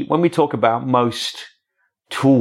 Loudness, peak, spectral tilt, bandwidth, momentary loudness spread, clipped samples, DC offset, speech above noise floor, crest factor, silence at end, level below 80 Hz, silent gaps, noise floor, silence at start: -18 LUFS; -2 dBFS; -6 dB/octave; 13.5 kHz; 11 LU; under 0.1%; under 0.1%; 53 dB; 16 dB; 0 s; -66 dBFS; none; -70 dBFS; 0 s